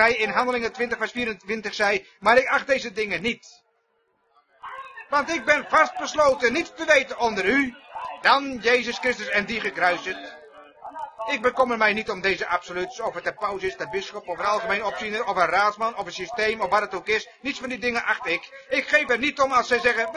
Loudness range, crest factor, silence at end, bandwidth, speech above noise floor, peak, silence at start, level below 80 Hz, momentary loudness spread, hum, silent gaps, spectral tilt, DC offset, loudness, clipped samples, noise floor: 4 LU; 20 dB; 0 s; 11 kHz; 45 dB; -4 dBFS; 0 s; -58 dBFS; 11 LU; none; none; -3 dB/octave; under 0.1%; -23 LUFS; under 0.1%; -69 dBFS